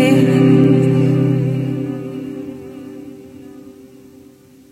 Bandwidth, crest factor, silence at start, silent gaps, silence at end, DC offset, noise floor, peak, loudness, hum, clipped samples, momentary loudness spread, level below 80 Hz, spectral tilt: 12.5 kHz; 16 dB; 0 s; none; 1 s; under 0.1%; -44 dBFS; 0 dBFS; -15 LUFS; none; under 0.1%; 24 LU; -56 dBFS; -8 dB/octave